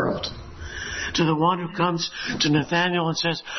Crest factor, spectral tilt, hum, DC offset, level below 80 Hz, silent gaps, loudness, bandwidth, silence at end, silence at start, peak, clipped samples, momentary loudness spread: 16 dB; -4.5 dB/octave; none; under 0.1%; -48 dBFS; none; -23 LUFS; 6.4 kHz; 0 s; 0 s; -8 dBFS; under 0.1%; 12 LU